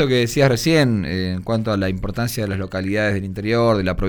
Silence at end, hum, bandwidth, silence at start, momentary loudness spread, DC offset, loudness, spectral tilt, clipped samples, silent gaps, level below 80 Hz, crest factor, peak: 0 s; none; over 20 kHz; 0 s; 8 LU; under 0.1%; -19 LUFS; -6 dB/octave; under 0.1%; none; -36 dBFS; 16 dB; -2 dBFS